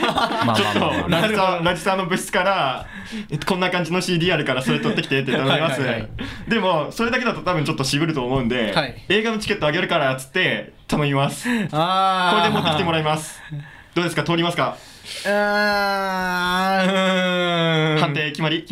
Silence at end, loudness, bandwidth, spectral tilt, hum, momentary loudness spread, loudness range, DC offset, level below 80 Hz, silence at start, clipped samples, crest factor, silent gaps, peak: 0 s; -20 LUFS; 16 kHz; -5 dB/octave; none; 8 LU; 2 LU; under 0.1%; -46 dBFS; 0 s; under 0.1%; 16 dB; none; -4 dBFS